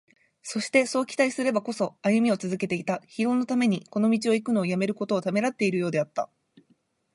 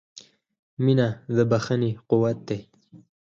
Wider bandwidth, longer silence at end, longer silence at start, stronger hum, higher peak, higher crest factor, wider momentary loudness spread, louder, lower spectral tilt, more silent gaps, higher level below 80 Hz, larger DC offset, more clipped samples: first, 11.5 kHz vs 7.4 kHz; first, 0.9 s vs 0.25 s; first, 0.45 s vs 0.15 s; neither; about the same, -8 dBFS vs -8 dBFS; about the same, 18 dB vs 18 dB; second, 8 LU vs 12 LU; about the same, -26 LUFS vs -24 LUFS; second, -5.5 dB/octave vs -7.5 dB/octave; second, none vs 0.59-0.77 s; second, -74 dBFS vs -60 dBFS; neither; neither